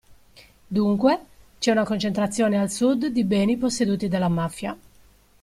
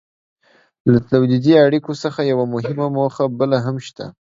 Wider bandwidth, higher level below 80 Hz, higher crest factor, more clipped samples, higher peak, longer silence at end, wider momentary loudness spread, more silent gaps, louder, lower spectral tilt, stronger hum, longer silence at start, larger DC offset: first, 14.5 kHz vs 7.6 kHz; about the same, -54 dBFS vs -52 dBFS; about the same, 18 dB vs 18 dB; neither; second, -6 dBFS vs 0 dBFS; first, 0.65 s vs 0.2 s; second, 7 LU vs 12 LU; neither; second, -23 LUFS vs -17 LUFS; second, -5.5 dB/octave vs -8 dB/octave; neither; second, 0.1 s vs 0.85 s; neither